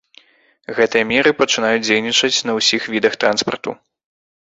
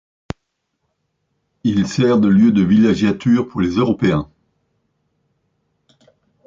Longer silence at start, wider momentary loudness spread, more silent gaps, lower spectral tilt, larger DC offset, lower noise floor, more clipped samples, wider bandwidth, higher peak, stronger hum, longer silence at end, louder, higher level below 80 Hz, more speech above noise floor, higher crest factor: second, 0.7 s vs 1.65 s; second, 8 LU vs 21 LU; neither; second, -2 dB/octave vs -7.5 dB/octave; neither; second, -51 dBFS vs -72 dBFS; neither; about the same, 8 kHz vs 7.6 kHz; first, 0 dBFS vs -4 dBFS; neither; second, 0.75 s vs 2.25 s; about the same, -16 LUFS vs -16 LUFS; second, -58 dBFS vs -46 dBFS; second, 34 dB vs 58 dB; about the same, 18 dB vs 14 dB